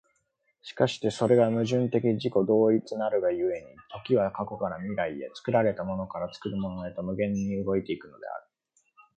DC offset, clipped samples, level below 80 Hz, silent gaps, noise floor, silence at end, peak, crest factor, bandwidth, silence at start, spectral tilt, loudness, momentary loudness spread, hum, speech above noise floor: under 0.1%; under 0.1%; -60 dBFS; none; -74 dBFS; 0.8 s; -8 dBFS; 20 dB; 9.2 kHz; 0.65 s; -7 dB/octave; -28 LUFS; 15 LU; none; 47 dB